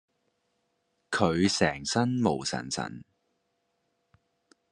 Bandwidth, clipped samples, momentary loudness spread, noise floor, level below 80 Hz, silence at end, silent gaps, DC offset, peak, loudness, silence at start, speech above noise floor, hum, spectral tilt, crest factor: 11.5 kHz; under 0.1%; 10 LU; -77 dBFS; -62 dBFS; 1.7 s; none; under 0.1%; -8 dBFS; -28 LUFS; 1.1 s; 49 dB; none; -4.5 dB/octave; 24 dB